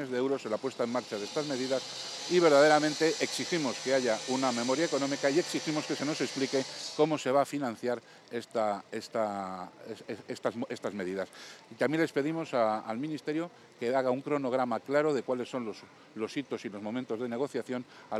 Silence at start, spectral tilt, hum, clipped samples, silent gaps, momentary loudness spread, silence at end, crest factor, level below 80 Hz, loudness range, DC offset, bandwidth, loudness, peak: 0 s; -4 dB/octave; none; under 0.1%; none; 11 LU; 0 s; 20 dB; -88 dBFS; 8 LU; under 0.1%; 14 kHz; -31 LUFS; -10 dBFS